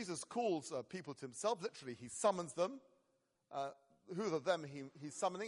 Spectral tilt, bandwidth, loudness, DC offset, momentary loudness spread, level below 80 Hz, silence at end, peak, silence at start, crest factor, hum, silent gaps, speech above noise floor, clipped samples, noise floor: -4 dB/octave; 11.5 kHz; -42 LUFS; under 0.1%; 12 LU; -86 dBFS; 0 s; -20 dBFS; 0 s; 22 dB; none; none; 40 dB; under 0.1%; -82 dBFS